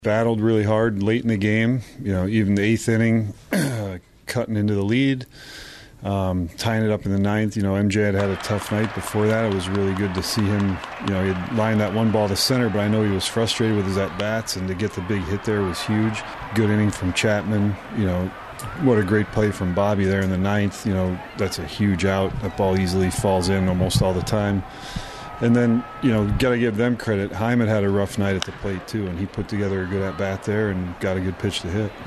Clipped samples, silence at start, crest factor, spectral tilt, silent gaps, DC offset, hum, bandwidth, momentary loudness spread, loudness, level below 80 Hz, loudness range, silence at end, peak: under 0.1%; 0 s; 18 dB; -6 dB/octave; none; under 0.1%; none; 13.5 kHz; 7 LU; -22 LUFS; -42 dBFS; 3 LU; 0 s; -4 dBFS